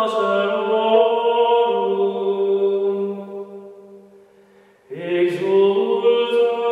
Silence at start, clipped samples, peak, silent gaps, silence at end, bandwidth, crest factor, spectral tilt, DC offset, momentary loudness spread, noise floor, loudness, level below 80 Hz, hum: 0 s; under 0.1%; -4 dBFS; none; 0 s; 9.2 kHz; 14 dB; -6.5 dB/octave; under 0.1%; 15 LU; -52 dBFS; -18 LUFS; -76 dBFS; none